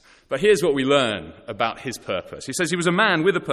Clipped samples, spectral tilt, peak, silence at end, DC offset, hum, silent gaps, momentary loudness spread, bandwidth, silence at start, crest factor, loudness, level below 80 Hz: under 0.1%; -4 dB/octave; -4 dBFS; 0 s; under 0.1%; none; none; 12 LU; 14 kHz; 0.3 s; 18 dB; -21 LUFS; -54 dBFS